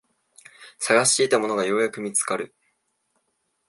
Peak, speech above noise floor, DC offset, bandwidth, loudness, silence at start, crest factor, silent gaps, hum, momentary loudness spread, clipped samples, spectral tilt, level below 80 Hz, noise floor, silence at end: -4 dBFS; 51 dB; under 0.1%; 11.5 kHz; -22 LUFS; 0.6 s; 22 dB; none; none; 12 LU; under 0.1%; -2 dB/octave; -76 dBFS; -73 dBFS; 1.25 s